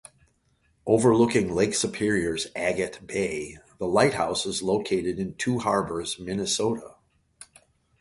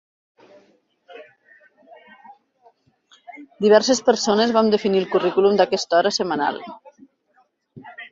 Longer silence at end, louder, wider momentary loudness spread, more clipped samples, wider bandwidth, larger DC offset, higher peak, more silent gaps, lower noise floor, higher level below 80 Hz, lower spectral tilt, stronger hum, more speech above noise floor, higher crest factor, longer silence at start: first, 0.55 s vs 0.05 s; second, -25 LUFS vs -18 LUFS; second, 9 LU vs 23 LU; neither; first, 11.5 kHz vs 7.8 kHz; neither; second, -6 dBFS vs -2 dBFS; neither; first, -67 dBFS vs -63 dBFS; first, -54 dBFS vs -66 dBFS; about the same, -4.5 dB/octave vs -4 dB/octave; neither; about the same, 42 dB vs 45 dB; about the same, 20 dB vs 20 dB; second, 0.85 s vs 1.1 s